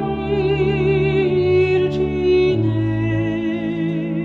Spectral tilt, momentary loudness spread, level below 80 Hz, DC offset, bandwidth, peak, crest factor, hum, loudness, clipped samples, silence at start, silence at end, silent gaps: -9 dB/octave; 6 LU; -38 dBFS; under 0.1%; 6.6 kHz; -6 dBFS; 10 dB; none; -18 LUFS; under 0.1%; 0 s; 0 s; none